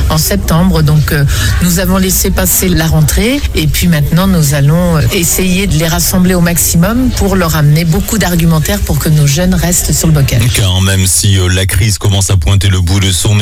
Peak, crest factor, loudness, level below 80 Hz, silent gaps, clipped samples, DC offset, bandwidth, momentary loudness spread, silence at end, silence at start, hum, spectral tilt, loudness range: 0 dBFS; 8 dB; -9 LUFS; -18 dBFS; none; under 0.1%; under 0.1%; 18.5 kHz; 2 LU; 0 s; 0 s; none; -4.5 dB/octave; 1 LU